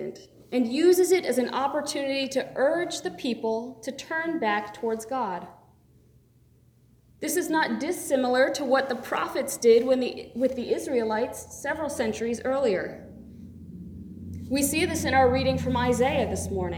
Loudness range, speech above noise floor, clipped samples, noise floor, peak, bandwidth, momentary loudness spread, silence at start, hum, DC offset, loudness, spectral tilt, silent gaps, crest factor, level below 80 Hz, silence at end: 7 LU; 34 dB; under 0.1%; -59 dBFS; -8 dBFS; 19.5 kHz; 16 LU; 0 s; none; under 0.1%; -26 LUFS; -4.5 dB/octave; none; 18 dB; -54 dBFS; 0 s